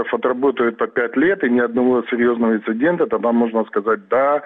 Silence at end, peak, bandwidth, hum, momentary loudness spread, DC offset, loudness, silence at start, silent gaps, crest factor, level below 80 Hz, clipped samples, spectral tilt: 0 s; -6 dBFS; 3.9 kHz; none; 3 LU; under 0.1%; -18 LUFS; 0 s; none; 12 dB; -60 dBFS; under 0.1%; -9 dB/octave